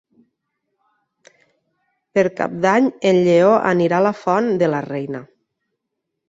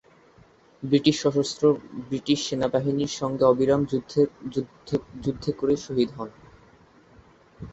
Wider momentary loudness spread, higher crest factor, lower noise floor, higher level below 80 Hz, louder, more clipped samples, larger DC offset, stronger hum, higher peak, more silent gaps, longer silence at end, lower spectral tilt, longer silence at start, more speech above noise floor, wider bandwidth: about the same, 12 LU vs 11 LU; about the same, 16 dB vs 20 dB; first, -78 dBFS vs -56 dBFS; second, -64 dBFS vs -56 dBFS; first, -17 LUFS vs -25 LUFS; neither; neither; neither; first, -2 dBFS vs -6 dBFS; neither; first, 1.05 s vs 0 s; about the same, -6.5 dB/octave vs -6 dB/octave; first, 2.15 s vs 0.8 s; first, 62 dB vs 31 dB; about the same, 7.8 kHz vs 8.2 kHz